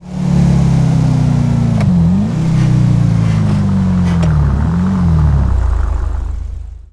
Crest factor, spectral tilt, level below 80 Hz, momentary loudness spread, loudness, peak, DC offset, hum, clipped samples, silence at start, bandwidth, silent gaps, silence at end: 10 dB; -8.5 dB/octave; -20 dBFS; 8 LU; -13 LUFS; 0 dBFS; under 0.1%; none; under 0.1%; 0 s; 11 kHz; none; 0.1 s